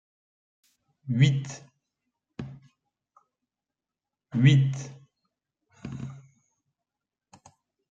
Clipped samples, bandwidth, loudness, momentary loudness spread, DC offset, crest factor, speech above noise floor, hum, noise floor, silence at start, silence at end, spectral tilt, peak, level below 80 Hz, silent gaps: under 0.1%; 7.6 kHz; -25 LUFS; 25 LU; under 0.1%; 22 dB; 67 dB; none; -90 dBFS; 1.05 s; 1.7 s; -6.5 dB/octave; -8 dBFS; -64 dBFS; none